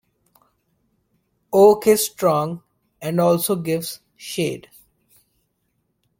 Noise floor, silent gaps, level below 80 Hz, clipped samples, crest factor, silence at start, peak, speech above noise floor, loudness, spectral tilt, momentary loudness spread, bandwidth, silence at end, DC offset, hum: -71 dBFS; none; -62 dBFS; under 0.1%; 20 dB; 1.5 s; -2 dBFS; 53 dB; -19 LUFS; -5 dB/octave; 18 LU; 17 kHz; 1.6 s; under 0.1%; none